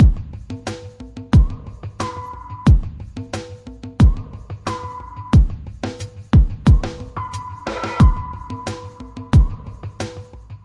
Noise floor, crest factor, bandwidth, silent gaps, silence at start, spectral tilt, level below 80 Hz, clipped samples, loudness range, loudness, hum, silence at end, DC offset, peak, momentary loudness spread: -36 dBFS; 16 dB; 11 kHz; none; 0 s; -7.5 dB/octave; -22 dBFS; under 0.1%; 3 LU; -20 LUFS; none; 0.1 s; under 0.1%; -2 dBFS; 18 LU